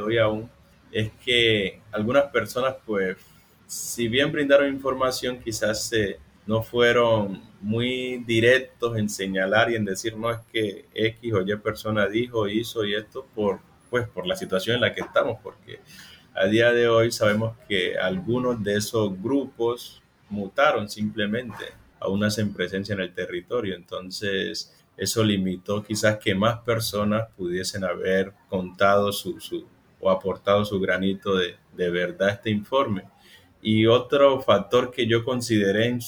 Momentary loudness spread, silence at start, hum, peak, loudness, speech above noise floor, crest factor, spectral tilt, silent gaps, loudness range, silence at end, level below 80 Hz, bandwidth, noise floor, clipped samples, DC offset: 12 LU; 0 s; none; -6 dBFS; -24 LUFS; 30 dB; 20 dB; -5 dB/octave; none; 4 LU; 0 s; -56 dBFS; over 20 kHz; -53 dBFS; under 0.1%; under 0.1%